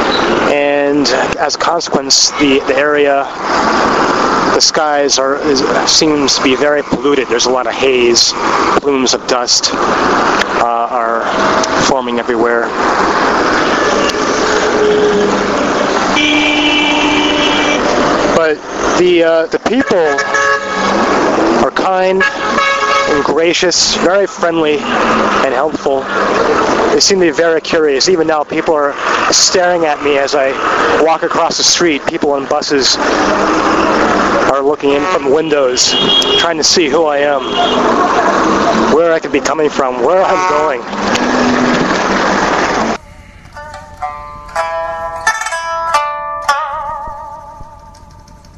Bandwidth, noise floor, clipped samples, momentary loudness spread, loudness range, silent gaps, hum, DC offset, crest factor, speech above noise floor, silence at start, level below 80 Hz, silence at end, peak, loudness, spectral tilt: 13.5 kHz; -37 dBFS; under 0.1%; 6 LU; 4 LU; none; none; under 0.1%; 12 dB; 26 dB; 0 s; -40 dBFS; 0.05 s; 0 dBFS; -11 LUFS; -2.5 dB/octave